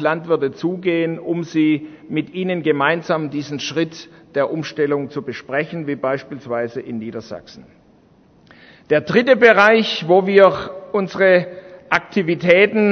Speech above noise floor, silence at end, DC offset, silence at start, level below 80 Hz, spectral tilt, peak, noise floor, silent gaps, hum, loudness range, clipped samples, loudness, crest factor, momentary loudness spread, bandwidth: 34 dB; 0 s; under 0.1%; 0 s; -60 dBFS; -6 dB/octave; 0 dBFS; -52 dBFS; none; none; 11 LU; under 0.1%; -18 LUFS; 18 dB; 15 LU; 6.6 kHz